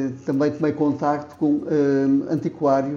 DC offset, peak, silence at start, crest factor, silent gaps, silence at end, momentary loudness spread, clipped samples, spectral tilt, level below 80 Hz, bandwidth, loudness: under 0.1%; -6 dBFS; 0 s; 16 dB; none; 0 s; 5 LU; under 0.1%; -8.5 dB/octave; -64 dBFS; 7 kHz; -21 LUFS